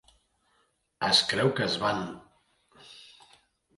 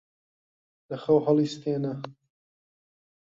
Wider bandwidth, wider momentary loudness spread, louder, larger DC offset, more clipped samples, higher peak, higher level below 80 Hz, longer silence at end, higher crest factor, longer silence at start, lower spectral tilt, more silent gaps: first, 11.5 kHz vs 7.6 kHz; first, 26 LU vs 17 LU; about the same, -26 LUFS vs -26 LUFS; neither; neither; about the same, -8 dBFS vs -10 dBFS; about the same, -64 dBFS vs -68 dBFS; second, 0.75 s vs 1.1 s; about the same, 24 dB vs 20 dB; about the same, 1 s vs 0.9 s; second, -3.5 dB/octave vs -7.5 dB/octave; neither